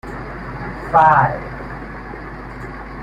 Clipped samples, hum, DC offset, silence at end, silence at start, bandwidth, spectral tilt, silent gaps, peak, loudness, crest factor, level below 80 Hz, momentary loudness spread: under 0.1%; none; under 0.1%; 0 s; 0.05 s; 11 kHz; -7.5 dB/octave; none; -2 dBFS; -16 LUFS; 18 dB; -36 dBFS; 19 LU